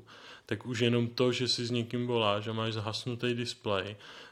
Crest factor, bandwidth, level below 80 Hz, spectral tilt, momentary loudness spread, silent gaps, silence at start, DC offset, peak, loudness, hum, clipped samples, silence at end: 20 dB; 13 kHz; -72 dBFS; -5 dB/octave; 11 LU; none; 0.1 s; under 0.1%; -12 dBFS; -31 LUFS; none; under 0.1%; 0 s